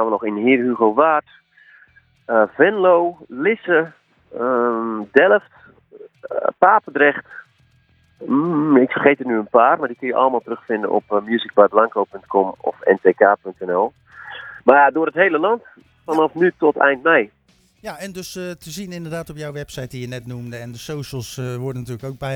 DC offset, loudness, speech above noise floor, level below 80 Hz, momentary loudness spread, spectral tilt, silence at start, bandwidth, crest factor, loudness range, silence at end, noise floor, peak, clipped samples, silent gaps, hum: under 0.1%; -17 LUFS; 39 dB; -58 dBFS; 16 LU; -6 dB/octave; 0 s; 16.5 kHz; 18 dB; 12 LU; 0 s; -57 dBFS; 0 dBFS; under 0.1%; none; none